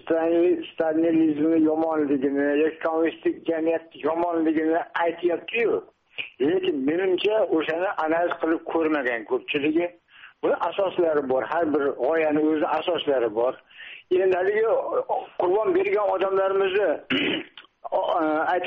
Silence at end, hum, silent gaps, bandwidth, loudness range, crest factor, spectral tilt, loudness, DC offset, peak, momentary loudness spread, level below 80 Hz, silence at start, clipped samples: 0 s; none; none; 4.8 kHz; 2 LU; 12 dB; -3 dB/octave; -24 LUFS; under 0.1%; -12 dBFS; 6 LU; -68 dBFS; 0.05 s; under 0.1%